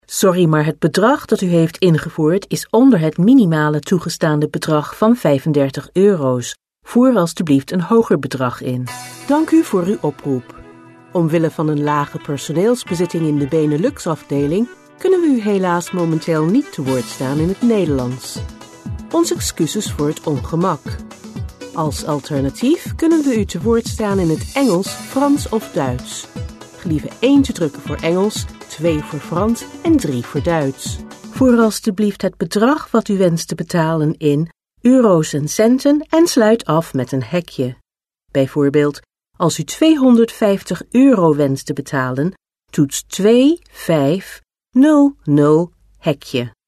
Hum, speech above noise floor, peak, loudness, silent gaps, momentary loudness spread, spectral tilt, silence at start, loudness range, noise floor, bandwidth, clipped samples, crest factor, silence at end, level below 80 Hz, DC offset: none; 45 dB; -2 dBFS; -16 LUFS; none; 11 LU; -6 dB/octave; 0.1 s; 5 LU; -61 dBFS; 13.5 kHz; under 0.1%; 14 dB; 0.2 s; -42 dBFS; under 0.1%